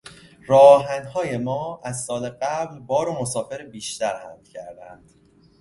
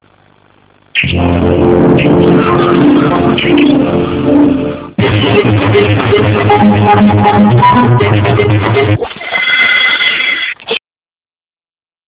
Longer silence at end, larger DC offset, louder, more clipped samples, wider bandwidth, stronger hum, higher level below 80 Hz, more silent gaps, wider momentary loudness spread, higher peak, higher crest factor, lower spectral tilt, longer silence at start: second, 0.65 s vs 1.3 s; neither; second, -21 LUFS vs -8 LUFS; second, under 0.1% vs 1%; first, 11.5 kHz vs 4 kHz; neither; second, -60 dBFS vs -30 dBFS; neither; first, 24 LU vs 7 LU; about the same, 0 dBFS vs 0 dBFS; first, 22 dB vs 8 dB; second, -4.5 dB/octave vs -10 dB/octave; second, 0.45 s vs 0.95 s